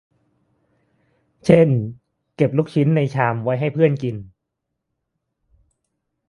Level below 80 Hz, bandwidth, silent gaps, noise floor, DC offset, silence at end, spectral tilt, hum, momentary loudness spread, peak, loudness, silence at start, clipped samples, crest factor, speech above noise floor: -56 dBFS; 11 kHz; none; -79 dBFS; under 0.1%; 2 s; -8.5 dB/octave; none; 12 LU; 0 dBFS; -19 LUFS; 1.45 s; under 0.1%; 22 dB; 61 dB